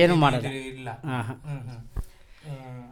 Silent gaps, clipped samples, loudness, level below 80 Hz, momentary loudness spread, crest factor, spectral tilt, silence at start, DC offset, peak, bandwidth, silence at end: none; under 0.1%; -28 LUFS; -44 dBFS; 19 LU; 20 dB; -6.5 dB/octave; 0 s; under 0.1%; -6 dBFS; 16 kHz; 0 s